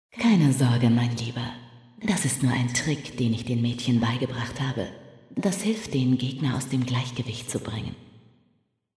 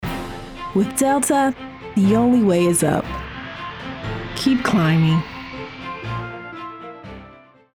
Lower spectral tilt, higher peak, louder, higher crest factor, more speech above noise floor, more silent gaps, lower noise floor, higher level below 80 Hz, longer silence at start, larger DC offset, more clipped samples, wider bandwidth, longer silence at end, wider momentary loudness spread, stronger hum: about the same, -5.5 dB/octave vs -5.5 dB/octave; second, -10 dBFS vs -4 dBFS; second, -26 LUFS vs -19 LUFS; about the same, 16 dB vs 16 dB; first, 45 dB vs 29 dB; neither; first, -69 dBFS vs -46 dBFS; second, -56 dBFS vs -44 dBFS; first, 0.15 s vs 0 s; neither; neither; second, 11 kHz vs 18.5 kHz; first, 0.9 s vs 0.35 s; second, 13 LU vs 17 LU; neither